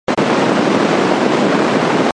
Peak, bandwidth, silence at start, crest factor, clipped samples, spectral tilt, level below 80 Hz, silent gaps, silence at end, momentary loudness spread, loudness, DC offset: 0 dBFS; 11 kHz; 0.1 s; 14 dB; under 0.1%; -5.5 dB/octave; -54 dBFS; none; 0.05 s; 0 LU; -14 LUFS; under 0.1%